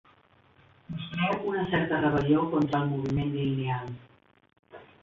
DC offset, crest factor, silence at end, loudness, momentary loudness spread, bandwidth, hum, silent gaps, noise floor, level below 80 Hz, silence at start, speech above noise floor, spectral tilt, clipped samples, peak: under 0.1%; 16 dB; 0.2 s; -28 LUFS; 13 LU; 7.2 kHz; none; none; -61 dBFS; -54 dBFS; 0.9 s; 34 dB; -8.5 dB/octave; under 0.1%; -14 dBFS